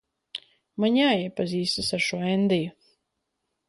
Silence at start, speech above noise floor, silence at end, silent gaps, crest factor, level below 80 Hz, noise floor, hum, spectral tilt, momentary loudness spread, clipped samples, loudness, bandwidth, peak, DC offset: 0.35 s; 55 dB; 1 s; none; 16 dB; -60 dBFS; -80 dBFS; none; -5 dB/octave; 18 LU; under 0.1%; -24 LUFS; 11.5 kHz; -10 dBFS; under 0.1%